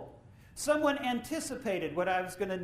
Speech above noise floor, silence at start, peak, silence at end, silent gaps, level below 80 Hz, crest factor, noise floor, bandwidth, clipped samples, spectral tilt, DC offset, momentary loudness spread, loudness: 22 dB; 0 s; -16 dBFS; 0 s; none; -62 dBFS; 16 dB; -54 dBFS; 15.5 kHz; under 0.1%; -4 dB/octave; under 0.1%; 8 LU; -32 LUFS